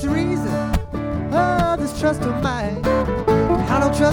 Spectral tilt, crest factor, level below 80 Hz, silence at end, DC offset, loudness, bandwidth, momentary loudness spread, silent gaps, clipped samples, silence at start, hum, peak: -6.5 dB/octave; 14 dB; -30 dBFS; 0 s; under 0.1%; -20 LUFS; 19 kHz; 5 LU; none; under 0.1%; 0 s; none; -4 dBFS